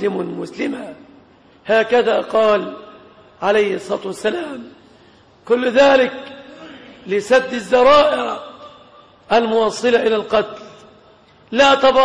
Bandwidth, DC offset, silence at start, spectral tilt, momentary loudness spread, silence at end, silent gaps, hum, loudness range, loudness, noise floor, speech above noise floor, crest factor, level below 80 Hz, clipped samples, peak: 11 kHz; under 0.1%; 0 s; -4 dB/octave; 24 LU; 0 s; none; none; 4 LU; -16 LUFS; -49 dBFS; 33 dB; 14 dB; -52 dBFS; under 0.1%; -2 dBFS